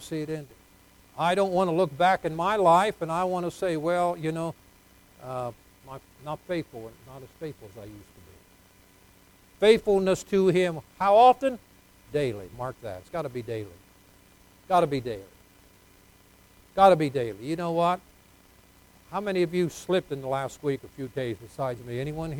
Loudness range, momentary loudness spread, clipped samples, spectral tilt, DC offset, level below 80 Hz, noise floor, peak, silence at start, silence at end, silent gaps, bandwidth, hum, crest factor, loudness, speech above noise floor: 15 LU; 20 LU; under 0.1%; -6 dB/octave; under 0.1%; -58 dBFS; -57 dBFS; -6 dBFS; 0 s; 0 s; none; 19.5 kHz; none; 22 dB; -26 LUFS; 31 dB